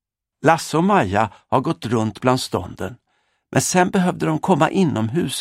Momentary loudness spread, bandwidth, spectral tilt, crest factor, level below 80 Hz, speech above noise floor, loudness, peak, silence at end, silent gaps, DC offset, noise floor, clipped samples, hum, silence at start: 7 LU; 16 kHz; -5 dB/octave; 20 dB; -54 dBFS; 49 dB; -19 LUFS; 0 dBFS; 0 s; none; under 0.1%; -68 dBFS; under 0.1%; none; 0.45 s